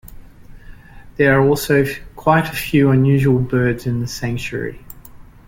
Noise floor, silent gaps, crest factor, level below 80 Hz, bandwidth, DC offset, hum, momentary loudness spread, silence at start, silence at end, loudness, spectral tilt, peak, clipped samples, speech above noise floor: -40 dBFS; none; 16 dB; -40 dBFS; 17 kHz; under 0.1%; none; 12 LU; 0.05 s; 0.25 s; -17 LUFS; -6.5 dB/octave; -2 dBFS; under 0.1%; 24 dB